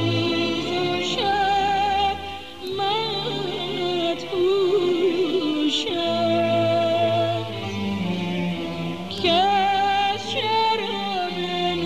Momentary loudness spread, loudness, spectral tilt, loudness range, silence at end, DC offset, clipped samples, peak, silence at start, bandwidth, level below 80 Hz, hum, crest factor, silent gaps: 7 LU; -22 LUFS; -5 dB/octave; 2 LU; 0 s; 0.6%; under 0.1%; -8 dBFS; 0 s; 14.5 kHz; -52 dBFS; none; 14 dB; none